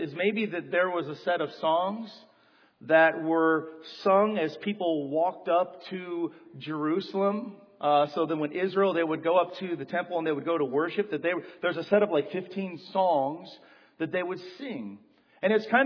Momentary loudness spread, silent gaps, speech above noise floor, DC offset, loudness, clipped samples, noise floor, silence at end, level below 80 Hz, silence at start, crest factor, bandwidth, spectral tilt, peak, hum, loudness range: 13 LU; none; 35 dB; under 0.1%; -28 LUFS; under 0.1%; -62 dBFS; 0 s; -82 dBFS; 0 s; 20 dB; 5.4 kHz; -7.5 dB/octave; -8 dBFS; none; 3 LU